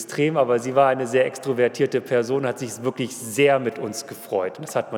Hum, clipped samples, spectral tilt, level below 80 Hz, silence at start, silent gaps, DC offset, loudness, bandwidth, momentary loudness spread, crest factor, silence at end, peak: none; under 0.1%; -5 dB/octave; -82 dBFS; 0 s; none; under 0.1%; -22 LUFS; 19 kHz; 9 LU; 18 dB; 0 s; -4 dBFS